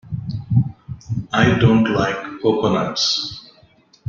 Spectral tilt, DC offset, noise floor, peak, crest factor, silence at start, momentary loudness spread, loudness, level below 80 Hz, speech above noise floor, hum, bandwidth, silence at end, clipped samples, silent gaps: -5.5 dB/octave; under 0.1%; -53 dBFS; -2 dBFS; 16 dB; 0.05 s; 13 LU; -19 LUFS; -44 dBFS; 36 dB; none; 7.4 kHz; 0.7 s; under 0.1%; none